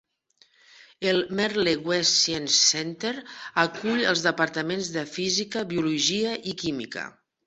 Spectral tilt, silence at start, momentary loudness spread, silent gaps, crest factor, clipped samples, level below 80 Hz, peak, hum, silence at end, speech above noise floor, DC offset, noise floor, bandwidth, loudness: -2.5 dB/octave; 0.8 s; 11 LU; none; 22 dB; under 0.1%; -64 dBFS; -6 dBFS; none; 0.35 s; 38 dB; under 0.1%; -63 dBFS; 8.2 kHz; -24 LUFS